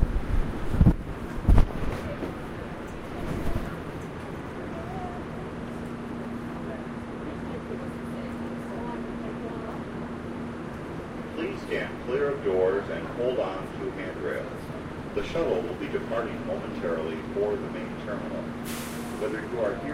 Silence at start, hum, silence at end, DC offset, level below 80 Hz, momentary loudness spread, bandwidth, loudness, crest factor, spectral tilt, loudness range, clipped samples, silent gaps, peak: 0 s; none; 0 s; under 0.1%; -34 dBFS; 11 LU; 16 kHz; -31 LUFS; 24 dB; -7 dB/octave; 7 LU; under 0.1%; none; -4 dBFS